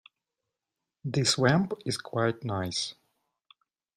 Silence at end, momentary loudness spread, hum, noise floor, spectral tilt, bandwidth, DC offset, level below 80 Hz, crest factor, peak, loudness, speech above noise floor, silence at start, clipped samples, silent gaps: 1.05 s; 9 LU; none; -88 dBFS; -4.5 dB/octave; 15.5 kHz; under 0.1%; -64 dBFS; 22 dB; -8 dBFS; -28 LUFS; 60 dB; 1.05 s; under 0.1%; none